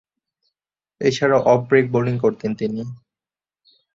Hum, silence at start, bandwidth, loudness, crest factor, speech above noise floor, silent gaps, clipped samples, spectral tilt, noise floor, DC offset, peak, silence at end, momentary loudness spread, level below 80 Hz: none; 1 s; 7.8 kHz; -19 LUFS; 20 dB; over 72 dB; none; under 0.1%; -6.5 dB/octave; under -90 dBFS; under 0.1%; -2 dBFS; 1 s; 10 LU; -58 dBFS